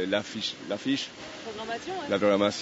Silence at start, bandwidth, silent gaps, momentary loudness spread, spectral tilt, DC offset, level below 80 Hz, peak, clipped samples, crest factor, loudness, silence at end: 0 s; 8 kHz; none; 13 LU; -3 dB/octave; under 0.1%; -68 dBFS; -10 dBFS; under 0.1%; 18 dB; -29 LUFS; 0 s